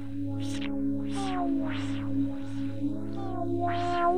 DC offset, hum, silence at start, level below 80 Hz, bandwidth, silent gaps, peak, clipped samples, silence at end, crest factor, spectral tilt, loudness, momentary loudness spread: 2%; none; 0 s; -50 dBFS; 10.5 kHz; none; -14 dBFS; under 0.1%; 0 s; 14 dB; -7 dB/octave; -32 LUFS; 6 LU